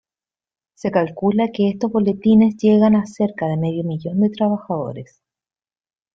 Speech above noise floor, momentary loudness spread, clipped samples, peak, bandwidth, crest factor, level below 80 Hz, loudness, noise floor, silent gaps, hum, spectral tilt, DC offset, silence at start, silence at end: over 73 dB; 11 LU; under 0.1%; -2 dBFS; 7 kHz; 16 dB; -58 dBFS; -18 LUFS; under -90 dBFS; none; none; -8.5 dB/octave; under 0.1%; 0.85 s; 1.1 s